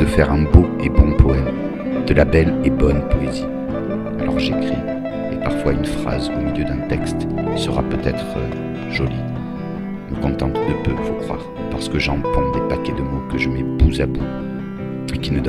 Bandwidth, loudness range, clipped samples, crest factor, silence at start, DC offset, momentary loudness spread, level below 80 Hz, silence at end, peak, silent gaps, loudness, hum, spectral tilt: 12 kHz; 5 LU; 0.1%; 18 dB; 0 s; under 0.1%; 11 LU; -24 dBFS; 0 s; 0 dBFS; none; -20 LUFS; none; -7.5 dB/octave